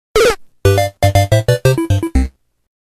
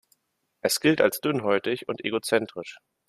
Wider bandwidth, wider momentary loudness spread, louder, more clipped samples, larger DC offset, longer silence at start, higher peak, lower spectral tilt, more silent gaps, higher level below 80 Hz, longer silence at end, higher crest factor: about the same, 14.5 kHz vs 15.5 kHz; second, 5 LU vs 13 LU; first, -14 LUFS vs -25 LUFS; neither; neither; second, 0.15 s vs 0.65 s; first, 0 dBFS vs -6 dBFS; first, -5.5 dB/octave vs -4 dB/octave; neither; first, -24 dBFS vs -68 dBFS; first, 0.55 s vs 0.3 s; second, 14 dB vs 20 dB